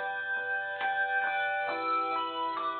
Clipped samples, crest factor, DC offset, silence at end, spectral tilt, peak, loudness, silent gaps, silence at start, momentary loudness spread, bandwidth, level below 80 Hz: under 0.1%; 12 dB; under 0.1%; 0 s; 1.5 dB/octave; -20 dBFS; -31 LUFS; none; 0 s; 4 LU; 4.6 kHz; -82 dBFS